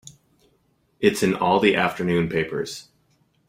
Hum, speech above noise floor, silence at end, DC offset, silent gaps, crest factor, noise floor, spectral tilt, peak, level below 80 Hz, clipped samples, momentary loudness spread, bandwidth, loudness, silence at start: none; 44 dB; 0.65 s; under 0.1%; none; 20 dB; -65 dBFS; -5 dB/octave; -2 dBFS; -56 dBFS; under 0.1%; 12 LU; 16 kHz; -22 LUFS; 0.05 s